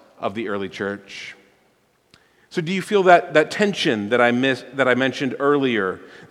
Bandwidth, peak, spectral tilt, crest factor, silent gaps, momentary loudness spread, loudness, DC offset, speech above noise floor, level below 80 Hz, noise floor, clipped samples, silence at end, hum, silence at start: 13 kHz; 0 dBFS; -5 dB/octave; 20 dB; none; 15 LU; -20 LUFS; under 0.1%; 42 dB; -68 dBFS; -62 dBFS; under 0.1%; 0.05 s; none; 0.2 s